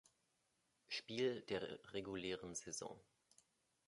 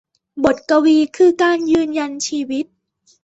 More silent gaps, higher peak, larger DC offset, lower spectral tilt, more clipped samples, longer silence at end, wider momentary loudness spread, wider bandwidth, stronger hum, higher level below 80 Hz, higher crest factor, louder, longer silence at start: neither; second, -28 dBFS vs -2 dBFS; neither; about the same, -3.5 dB/octave vs -3.5 dB/octave; neither; first, 0.85 s vs 0.6 s; second, 8 LU vs 11 LU; first, 11.5 kHz vs 8.2 kHz; neither; second, -78 dBFS vs -54 dBFS; first, 20 dB vs 14 dB; second, -46 LUFS vs -16 LUFS; first, 0.9 s vs 0.35 s